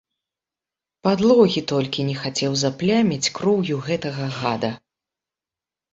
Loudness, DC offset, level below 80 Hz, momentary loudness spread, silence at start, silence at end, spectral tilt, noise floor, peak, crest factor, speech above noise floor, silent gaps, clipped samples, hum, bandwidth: -21 LUFS; under 0.1%; -58 dBFS; 9 LU; 1.05 s; 1.15 s; -5 dB/octave; -89 dBFS; -2 dBFS; 20 dB; 69 dB; none; under 0.1%; none; 8.2 kHz